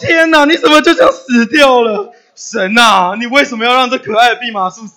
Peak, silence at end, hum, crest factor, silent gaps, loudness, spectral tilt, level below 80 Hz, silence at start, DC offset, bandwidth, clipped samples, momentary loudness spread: 0 dBFS; 0.05 s; none; 10 dB; none; -9 LUFS; -3 dB/octave; -50 dBFS; 0 s; under 0.1%; over 20 kHz; 2%; 11 LU